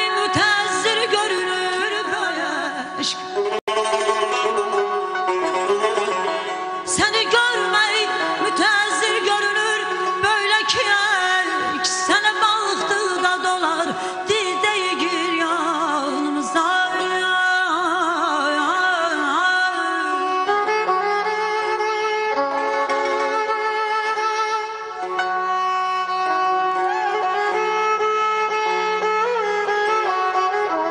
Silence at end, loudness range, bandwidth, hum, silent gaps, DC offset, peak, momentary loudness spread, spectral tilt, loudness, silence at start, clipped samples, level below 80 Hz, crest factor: 0 s; 3 LU; 11 kHz; none; 3.61-3.67 s; under 0.1%; -4 dBFS; 5 LU; -1.5 dB/octave; -19 LUFS; 0 s; under 0.1%; -62 dBFS; 16 dB